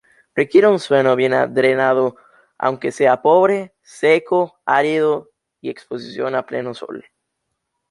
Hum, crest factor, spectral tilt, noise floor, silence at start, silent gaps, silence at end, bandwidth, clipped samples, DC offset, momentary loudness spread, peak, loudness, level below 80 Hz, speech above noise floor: none; 16 dB; -6 dB/octave; -75 dBFS; 0.35 s; none; 0.9 s; 11.5 kHz; under 0.1%; under 0.1%; 17 LU; -2 dBFS; -17 LUFS; -66 dBFS; 59 dB